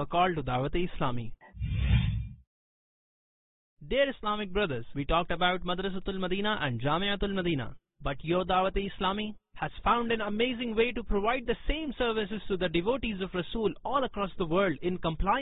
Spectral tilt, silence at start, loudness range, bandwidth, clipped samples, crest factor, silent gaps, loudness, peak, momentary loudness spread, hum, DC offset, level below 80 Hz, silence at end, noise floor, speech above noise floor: -10 dB/octave; 0 s; 3 LU; 4.1 kHz; under 0.1%; 18 dB; 2.47-3.77 s; -31 LUFS; -12 dBFS; 8 LU; none; under 0.1%; -42 dBFS; 0 s; under -90 dBFS; over 60 dB